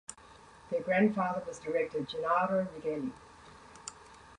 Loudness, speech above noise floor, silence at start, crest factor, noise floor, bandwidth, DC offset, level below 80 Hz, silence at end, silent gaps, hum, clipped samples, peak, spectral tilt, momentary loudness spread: -32 LUFS; 24 dB; 0.1 s; 18 dB; -56 dBFS; 11 kHz; under 0.1%; -66 dBFS; 0 s; none; none; under 0.1%; -16 dBFS; -5.5 dB/octave; 25 LU